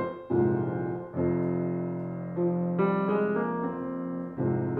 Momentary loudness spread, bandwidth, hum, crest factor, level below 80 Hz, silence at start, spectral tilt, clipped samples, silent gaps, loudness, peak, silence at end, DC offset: 7 LU; 4.1 kHz; none; 14 dB; -60 dBFS; 0 s; -12 dB/octave; under 0.1%; none; -29 LUFS; -14 dBFS; 0 s; under 0.1%